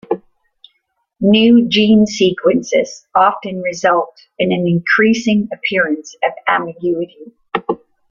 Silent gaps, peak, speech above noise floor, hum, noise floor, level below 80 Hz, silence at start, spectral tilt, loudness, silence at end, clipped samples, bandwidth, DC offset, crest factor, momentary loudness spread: none; -2 dBFS; 53 dB; none; -67 dBFS; -54 dBFS; 0.1 s; -5.5 dB/octave; -15 LUFS; 0.35 s; under 0.1%; 7.4 kHz; under 0.1%; 14 dB; 12 LU